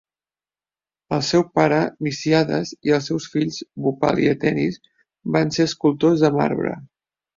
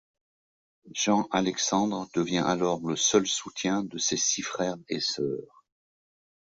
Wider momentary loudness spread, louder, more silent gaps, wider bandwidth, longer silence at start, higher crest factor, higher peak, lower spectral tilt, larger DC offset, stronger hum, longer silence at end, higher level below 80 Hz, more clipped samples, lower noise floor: about the same, 8 LU vs 7 LU; first, -20 LUFS vs -27 LUFS; neither; about the same, 7.6 kHz vs 8 kHz; first, 1.1 s vs 0.85 s; about the same, 18 dB vs 20 dB; first, -2 dBFS vs -8 dBFS; first, -6 dB/octave vs -3 dB/octave; neither; neither; second, 0.5 s vs 1.05 s; first, -56 dBFS vs -66 dBFS; neither; about the same, under -90 dBFS vs under -90 dBFS